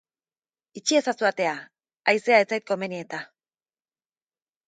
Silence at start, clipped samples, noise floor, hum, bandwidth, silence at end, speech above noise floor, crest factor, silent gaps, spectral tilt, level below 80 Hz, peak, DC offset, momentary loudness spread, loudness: 0.75 s; under 0.1%; under -90 dBFS; none; 9.4 kHz; 1.4 s; over 66 dB; 22 dB; none; -3 dB/octave; -82 dBFS; -6 dBFS; under 0.1%; 16 LU; -24 LUFS